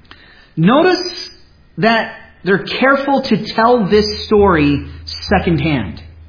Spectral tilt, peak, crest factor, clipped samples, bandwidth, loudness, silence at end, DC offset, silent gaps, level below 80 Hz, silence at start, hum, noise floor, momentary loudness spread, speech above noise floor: -6.5 dB/octave; 0 dBFS; 14 dB; under 0.1%; 5.4 kHz; -14 LUFS; 0.05 s; under 0.1%; none; -36 dBFS; 0.55 s; none; -42 dBFS; 15 LU; 29 dB